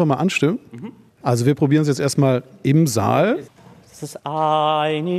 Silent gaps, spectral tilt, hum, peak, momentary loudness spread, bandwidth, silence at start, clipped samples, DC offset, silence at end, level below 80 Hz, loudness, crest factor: none; -6 dB/octave; none; -4 dBFS; 16 LU; 14 kHz; 0 s; under 0.1%; under 0.1%; 0 s; -62 dBFS; -19 LUFS; 16 dB